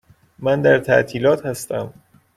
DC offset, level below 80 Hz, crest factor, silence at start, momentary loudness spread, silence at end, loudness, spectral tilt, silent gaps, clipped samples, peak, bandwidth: under 0.1%; -54 dBFS; 16 dB; 0.4 s; 12 LU; 0.45 s; -18 LUFS; -5.5 dB/octave; none; under 0.1%; -2 dBFS; 15 kHz